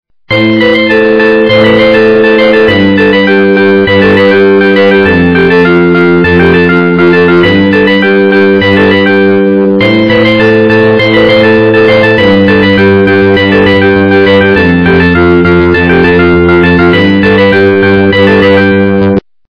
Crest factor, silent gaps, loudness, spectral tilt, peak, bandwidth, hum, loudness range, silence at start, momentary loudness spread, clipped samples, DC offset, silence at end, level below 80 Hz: 4 dB; none; -5 LUFS; -8 dB/octave; 0 dBFS; 5.4 kHz; none; 1 LU; 0.3 s; 1 LU; 5%; 0.6%; 0.3 s; -32 dBFS